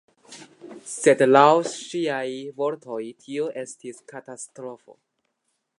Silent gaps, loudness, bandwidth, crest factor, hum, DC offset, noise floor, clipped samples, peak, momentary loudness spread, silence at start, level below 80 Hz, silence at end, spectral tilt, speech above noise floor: none; -22 LUFS; 11.5 kHz; 24 dB; none; under 0.1%; -76 dBFS; under 0.1%; 0 dBFS; 24 LU; 0.3 s; -82 dBFS; 0.85 s; -4.5 dB/octave; 53 dB